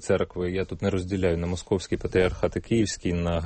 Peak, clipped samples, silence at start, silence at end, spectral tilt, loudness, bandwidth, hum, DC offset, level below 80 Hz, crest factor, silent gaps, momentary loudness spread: -8 dBFS; under 0.1%; 0 s; 0 s; -6 dB/octave; -27 LUFS; 8.8 kHz; none; under 0.1%; -42 dBFS; 16 dB; none; 5 LU